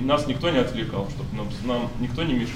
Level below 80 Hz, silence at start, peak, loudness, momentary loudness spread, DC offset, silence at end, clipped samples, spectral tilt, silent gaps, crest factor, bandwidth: -38 dBFS; 0 s; -8 dBFS; -26 LUFS; 8 LU; under 0.1%; 0 s; under 0.1%; -6.5 dB/octave; none; 18 dB; 15 kHz